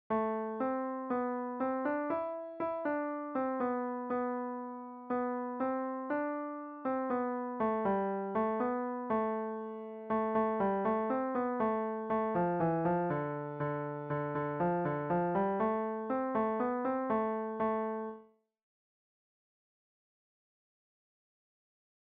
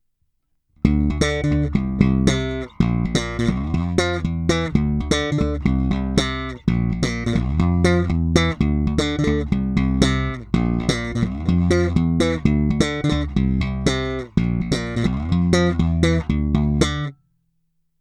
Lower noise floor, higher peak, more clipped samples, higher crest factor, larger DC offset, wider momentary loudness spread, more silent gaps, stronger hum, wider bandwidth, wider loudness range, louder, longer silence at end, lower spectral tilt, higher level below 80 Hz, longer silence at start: second, -58 dBFS vs -68 dBFS; second, -20 dBFS vs 0 dBFS; neither; second, 14 dB vs 20 dB; neither; about the same, 7 LU vs 5 LU; neither; neither; second, 4.5 kHz vs 12 kHz; first, 4 LU vs 1 LU; second, -35 LUFS vs -20 LUFS; first, 3.8 s vs 0.85 s; first, -7.5 dB/octave vs -6 dB/octave; second, -70 dBFS vs -28 dBFS; second, 0.1 s vs 0.85 s